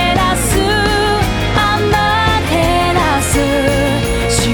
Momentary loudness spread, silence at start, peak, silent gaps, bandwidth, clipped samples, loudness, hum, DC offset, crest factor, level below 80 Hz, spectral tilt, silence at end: 2 LU; 0 s; 0 dBFS; none; 19.5 kHz; under 0.1%; -13 LUFS; none; under 0.1%; 12 dB; -24 dBFS; -4 dB/octave; 0 s